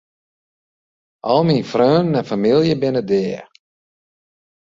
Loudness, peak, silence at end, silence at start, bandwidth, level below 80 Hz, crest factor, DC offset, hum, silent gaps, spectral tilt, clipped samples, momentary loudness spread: -17 LUFS; -2 dBFS; 1.25 s; 1.25 s; 7.6 kHz; -58 dBFS; 18 dB; under 0.1%; none; none; -7.5 dB/octave; under 0.1%; 9 LU